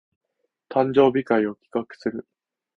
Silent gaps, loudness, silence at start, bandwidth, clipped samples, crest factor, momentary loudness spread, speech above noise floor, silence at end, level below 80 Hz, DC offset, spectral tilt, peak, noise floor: none; -23 LUFS; 0.7 s; 6.4 kHz; under 0.1%; 20 dB; 13 LU; 46 dB; 0.55 s; -62 dBFS; under 0.1%; -8 dB/octave; -4 dBFS; -68 dBFS